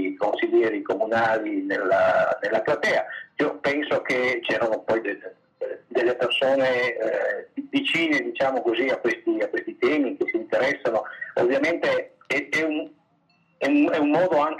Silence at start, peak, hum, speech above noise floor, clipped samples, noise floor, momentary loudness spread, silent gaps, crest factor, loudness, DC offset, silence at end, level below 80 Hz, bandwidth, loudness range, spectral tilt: 0 s; -10 dBFS; none; 41 dB; under 0.1%; -64 dBFS; 7 LU; none; 14 dB; -23 LUFS; under 0.1%; 0 s; -70 dBFS; 10.5 kHz; 2 LU; -5 dB/octave